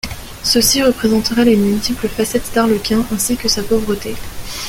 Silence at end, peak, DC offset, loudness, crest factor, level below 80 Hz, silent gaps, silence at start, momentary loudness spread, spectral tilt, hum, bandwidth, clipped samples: 0 s; 0 dBFS; under 0.1%; -15 LUFS; 14 dB; -34 dBFS; none; 0.05 s; 10 LU; -3.5 dB/octave; none; 17 kHz; under 0.1%